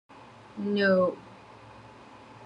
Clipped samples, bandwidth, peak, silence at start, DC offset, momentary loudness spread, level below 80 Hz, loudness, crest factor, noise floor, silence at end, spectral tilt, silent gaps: under 0.1%; 8.4 kHz; -14 dBFS; 0.55 s; under 0.1%; 26 LU; -68 dBFS; -26 LUFS; 18 dB; -50 dBFS; 0 s; -7.5 dB/octave; none